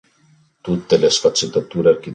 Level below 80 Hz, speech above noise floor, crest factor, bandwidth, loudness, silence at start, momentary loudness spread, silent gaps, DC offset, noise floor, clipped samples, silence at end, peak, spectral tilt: -54 dBFS; 39 dB; 16 dB; 9.4 kHz; -17 LUFS; 0.65 s; 10 LU; none; under 0.1%; -55 dBFS; under 0.1%; 0 s; -2 dBFS; -4 dB/octave